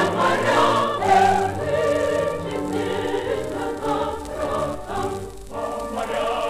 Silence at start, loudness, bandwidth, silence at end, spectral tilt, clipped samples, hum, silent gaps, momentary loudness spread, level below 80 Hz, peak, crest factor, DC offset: 0 s; -22 LUFS; 15.5 kHz; 0 s; -5 dB/octave; under 0.1%; none; none; 10 LU; -44 dBFS; -6 dBFS; 16 dB; under 0.1%